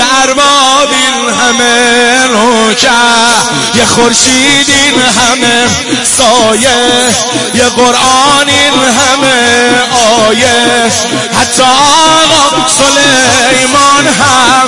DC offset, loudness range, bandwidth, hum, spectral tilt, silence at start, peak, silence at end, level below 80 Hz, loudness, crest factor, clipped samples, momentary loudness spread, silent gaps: 1%; 1 LU; 12 kHz; none; -1.5 dB/octave; 0 s; 0 dBFS; 0 s; -38 dBFS; -5 LUFS; 6 dB; 1%; 4 LU; none